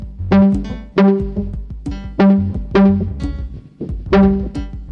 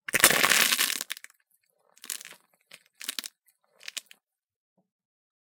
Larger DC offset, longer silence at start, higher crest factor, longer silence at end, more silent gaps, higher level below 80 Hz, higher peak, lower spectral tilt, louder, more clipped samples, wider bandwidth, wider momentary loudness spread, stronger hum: neither; second, 0 s vs 0.15 s; second, 14 dB vs 30 dB; second, 0 s vs 1.55 s; neither; first, -28 dBFS vs -72 dBFS; about the same, 0 dBFS vs 0 dBFS; first, -9.5 dB/octave vs 0.5 dB/octave; first, -15 LUFS vs -23 LUFS; neither; second, 6 kHz vs 19 kHz; second, 15 LU vs 22 LU; neither